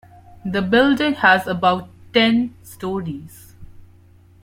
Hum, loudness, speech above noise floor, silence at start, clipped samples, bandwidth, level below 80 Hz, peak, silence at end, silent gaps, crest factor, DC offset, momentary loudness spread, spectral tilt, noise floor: none; -18 LUFS; 31 dB; 0.45 s; under 0.1%; 16 kHz; -52 dBFS; -2 dBFS; 0.6 s; none; 18 dB; under 0.1%; 16 LU; -5.5 dB/octave; -49 dBFS